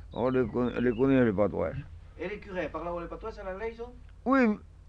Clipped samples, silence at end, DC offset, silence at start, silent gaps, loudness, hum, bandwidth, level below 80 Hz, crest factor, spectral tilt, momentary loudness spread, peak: under 0.1%; 0.2 s; under 0.1%; 0 s; none; -29 LUFS; none; 7 kHz; -48 dBFS; 16 dB; -9 dB/octave; 15 LU; -14 dBFS